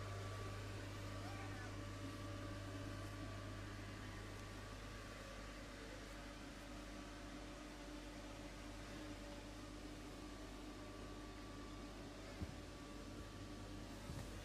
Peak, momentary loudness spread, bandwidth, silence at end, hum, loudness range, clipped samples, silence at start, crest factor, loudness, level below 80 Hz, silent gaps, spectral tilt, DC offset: -34 dBFS; 4 LU; 15.5 kHz; 0 s; none; 3 LU; under 0.1%; 0 s; 18 dB; -52 LUFS; -58 dBFS; none; -5 dB/octave; under 0.1%